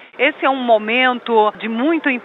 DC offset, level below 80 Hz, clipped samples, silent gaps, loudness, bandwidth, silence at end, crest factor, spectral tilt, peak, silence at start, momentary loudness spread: under 0.1%; -72 dBFS; under 0.1%; none; -16 LUFS; 5.4 kHz; 0 s; 16 dB; -6.5 dB/octave; -2 dBFS; 0 s; 4 LU